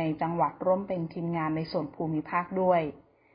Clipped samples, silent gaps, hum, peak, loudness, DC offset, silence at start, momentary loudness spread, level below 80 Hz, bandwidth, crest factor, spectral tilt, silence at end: under 0.1%; none; none; -12 dBFS; -29 LUFS; under 0.1%; 0 s; 7 LU; -62 dBFS; 5.4 kHz; 16 dB; -11.5 dB/octave; 0.35 s